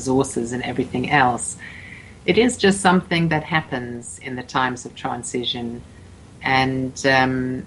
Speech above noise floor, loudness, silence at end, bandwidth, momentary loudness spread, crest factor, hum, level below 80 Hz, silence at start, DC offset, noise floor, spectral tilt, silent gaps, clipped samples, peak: 22 dB; -20 LUFS; 0 s; 11.5 kHz; 15 LU; 20 dB; none; -48 dBFS; 0 s; under 0.1%; -43 dBFS; -4.5 dB/octave; none; under 0.1%; 0 dBFS